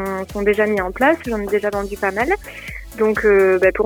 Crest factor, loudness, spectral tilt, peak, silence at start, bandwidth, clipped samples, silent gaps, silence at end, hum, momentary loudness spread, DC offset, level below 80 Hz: 14 dB; -18 LUFS; -6 dB/octave; -4 dBFS; 0 s; 18.5 kHz; under 0.1%; none; 0 s; none; 10 LU; under 0.1%; -38 dBFS